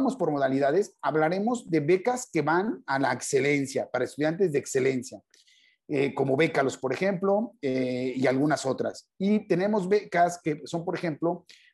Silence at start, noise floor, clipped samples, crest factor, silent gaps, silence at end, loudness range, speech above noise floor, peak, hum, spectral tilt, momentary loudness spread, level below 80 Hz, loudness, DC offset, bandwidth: 0 s; -62 dBFS; under 0.1%; 16 dB; none; 0.35 s; 2 LU; 36 dB; -10 dBFS; none; -5.5 dB/octave; 7 LU; -74 dBFS; -27 LUFS; under 0.1%; 12.5 kHz